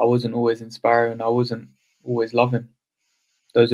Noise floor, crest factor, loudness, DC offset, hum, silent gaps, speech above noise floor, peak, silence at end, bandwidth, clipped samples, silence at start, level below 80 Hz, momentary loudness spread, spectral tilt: -73 dBFS; 20 dB; -22 LUFS; under 0.1%; none; none; 52 dB; -2 dBFS; 0 s; 11 kHz; under 0.1%; 0 s; -68 dBFS; 9 LU; -7.5 dB/octave